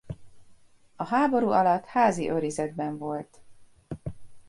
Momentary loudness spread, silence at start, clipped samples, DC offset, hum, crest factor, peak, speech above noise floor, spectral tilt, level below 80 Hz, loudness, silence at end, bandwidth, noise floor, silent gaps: 20 LU; 0.05 s; under 0.1%; under 0.1%; none; 18 dB; -10 dBFS; 29 dB; -6 dB/octave; -56 dBFS; -26 LUFS; 0.1 s; 11.5 kHz; -54 dBFS; none